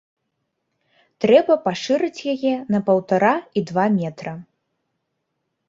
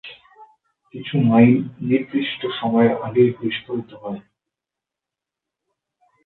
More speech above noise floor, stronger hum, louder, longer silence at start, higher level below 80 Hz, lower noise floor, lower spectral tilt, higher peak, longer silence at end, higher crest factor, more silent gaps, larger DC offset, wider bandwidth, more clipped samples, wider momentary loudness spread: second, 57 dB vs 68 dB; neither; about the same, -20 LUFS vs -19 LUFS; first, 1.2 s vs 0.05 s; about the same, -64 dBFS vs -62 dBFS; second, -76 dBFS vs -86 dBFS; second, -6.5 dB/octave vs -11 dB/octave; about the same, -2 dBFS vs 0 dBFS; second, 1.25 s vs 2.05 s; about the same, 20 dB vs 20 dB; neither; neither; first, 7.6 kHz vs 4.2 kHz; neither; second, 11 LU vs 19 LU